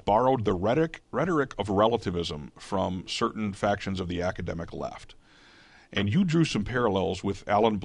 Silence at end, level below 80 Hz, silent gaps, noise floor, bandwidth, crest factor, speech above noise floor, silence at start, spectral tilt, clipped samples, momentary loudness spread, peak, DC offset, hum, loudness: 0 s; -48 dBFS; none; -55 dBFS; 11 kHz; 18 dB; 29 dB; 0.05 s; -6 dB/octave; under 0.1%; 11 LU; -8 dBFS; under 0.1%; none; -28 LUFS